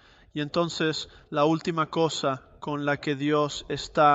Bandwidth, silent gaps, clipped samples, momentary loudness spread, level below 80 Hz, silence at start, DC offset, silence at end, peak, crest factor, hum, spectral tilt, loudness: 8.2 kHz; none; under 0.1%; 10 LU; -58 dBFS; 0.35 s; under 0.1%; 0 s; -8 dBFS; 18 dB; none; -5 dB/octave; -27 LUFS